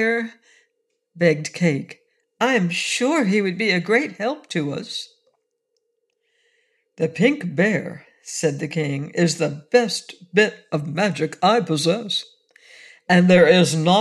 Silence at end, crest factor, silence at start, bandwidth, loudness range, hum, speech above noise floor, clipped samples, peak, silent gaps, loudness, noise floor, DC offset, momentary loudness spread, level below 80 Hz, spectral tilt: 0 s; 18 dB; 0 s; 12.5 kHz; 6 LU; none; 54 dB; under 0.1%; -4 dBFS; none; -20 LUFS; -74 dBFS; under 0.1%; 12 LU; -66 dBFS; -5 dB/octave